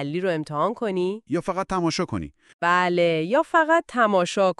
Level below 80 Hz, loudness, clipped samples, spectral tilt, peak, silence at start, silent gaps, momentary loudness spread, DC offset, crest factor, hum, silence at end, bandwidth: -54 dBFS; -23 LUFS; under 0.1%; -5.5 dB/octave; -6 dBFS; 0 s; 2.54-2.59 s; 8 LU; under 0.1%; 16 dB; none; 0.05 s; 11.5 kHz